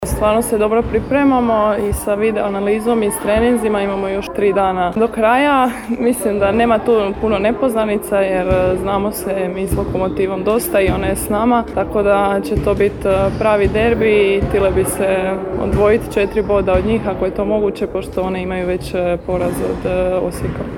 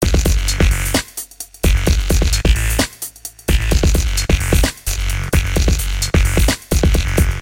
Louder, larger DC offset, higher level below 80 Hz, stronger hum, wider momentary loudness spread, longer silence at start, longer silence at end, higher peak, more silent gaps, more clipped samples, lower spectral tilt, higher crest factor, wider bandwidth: about the same, -16 LUFS vs -17 LUFS; neither; second, -32 dBFS vs -16 dBFS; neither; about the same, 6 LU vs 6 LU; about the same, 0 s vs 0 s; about the same, 0 s vs 0 s; about the same, -2 dBFS vs -2 dBFS; neither; neither; first, -6 dB/octave vs -4.5 dB/octave; about the same, 14 dB vs 14 dB; first, 19 kHz vs 17 kHz